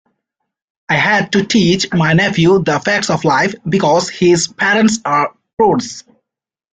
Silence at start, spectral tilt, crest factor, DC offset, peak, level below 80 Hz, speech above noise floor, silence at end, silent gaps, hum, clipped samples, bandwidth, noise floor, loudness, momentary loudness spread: 0.9 s; -4.5 dB/octave; 12 dB; under 0.1%; -2 dBFS; -50 dBFS; 71 dB; 0.7 s; 5.53-5.57 s; none; under 0.1%; 9.4 kHz; -84 dBFS; -13 LUFS; 4 LU